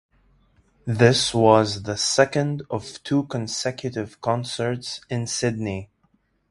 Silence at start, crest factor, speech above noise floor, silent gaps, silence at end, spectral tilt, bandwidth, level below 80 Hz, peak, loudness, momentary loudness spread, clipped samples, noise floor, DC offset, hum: 0.85 s; 22 dB; 44 dB; none; 0.65 s; -4.5 dB/octave; 11.5 kHz; -52 dBFS; 0 dBFS; -22 LUFS; 13 LU; under 0.1%; -66 dBFS; under 0.1%; none